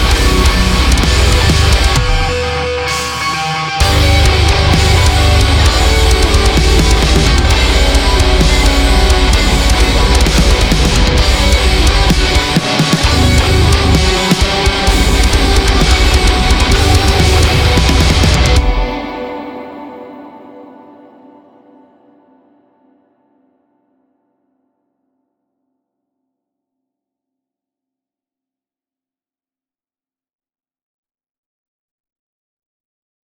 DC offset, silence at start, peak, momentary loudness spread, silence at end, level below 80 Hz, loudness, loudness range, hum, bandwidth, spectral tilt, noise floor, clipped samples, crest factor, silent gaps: under 0.1%; 0 s; 0 dBFS; 6 LU; 12.65 s; -14 dBFS; -11 LUFS; 3 LU; none; 18 kHz; -4.5 dB/octave; under -90 dBFS; under 0.1%; 12 dB; none